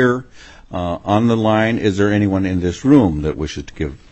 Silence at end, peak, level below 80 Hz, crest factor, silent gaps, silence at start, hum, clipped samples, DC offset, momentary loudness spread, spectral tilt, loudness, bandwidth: 0.15 s; 0 dBFS; -36 dBFS; 16 dB; none; 0 s; none; under 0.1%; under 0.1%; 13 LU; -7 dB/octave; -17 LUFS; 8.4 kHz